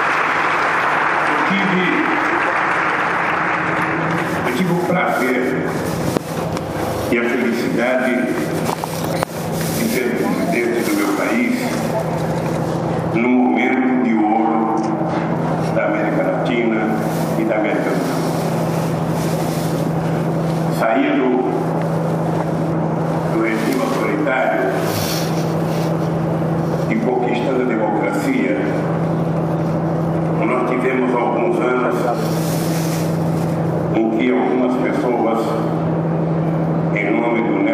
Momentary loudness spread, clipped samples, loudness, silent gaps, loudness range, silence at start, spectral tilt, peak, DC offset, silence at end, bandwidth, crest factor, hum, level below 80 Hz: 4 LU; under 0.1%; -18 LUFS; none; 2 LU; 0 s; -6.5 dB/octave; 0 dBFS; under 0.1%; 0 s; 15.5 kHz; 18 dB; none; -48 dBFS